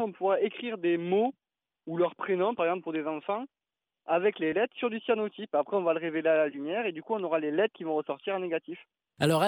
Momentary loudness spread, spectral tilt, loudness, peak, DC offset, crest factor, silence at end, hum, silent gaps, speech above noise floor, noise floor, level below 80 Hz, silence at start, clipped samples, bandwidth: 7 LU; -6 dB/octave; -30 LUFS; -12 dBFS; under 0.1%; 18 dB; 0 s; none; none; over 61 dB; under -90 dBFS; -76 dBFS; 0 s; under 0.1%; 16 kHz